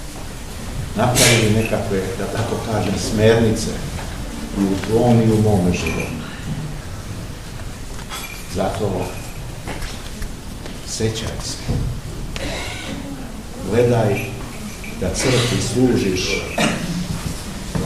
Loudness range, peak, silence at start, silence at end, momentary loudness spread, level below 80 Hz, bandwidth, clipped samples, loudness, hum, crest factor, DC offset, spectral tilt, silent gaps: 9 LU; 0 dBFS; 0 s; 0 s; 16 LU; -32 dBFS; 15.5 kHz; under 0.1%; -20 LUFS; none; 20 dB; 0.7%; -5 dB/octave; none